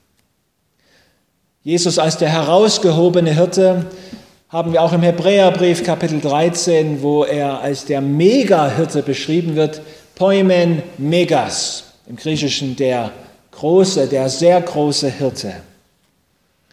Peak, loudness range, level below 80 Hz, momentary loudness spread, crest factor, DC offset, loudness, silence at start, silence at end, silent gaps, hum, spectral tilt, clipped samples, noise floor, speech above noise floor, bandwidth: 0 dBFS; 3 LU; -56 dBFS; 10 LU; 16 dB; under 0.1%; -15 LUFS; 1.65 s; 1.1 s; none; none; -5 dB/octave; under 0.1%; -65 dBFS; 50 dB; 15 kHz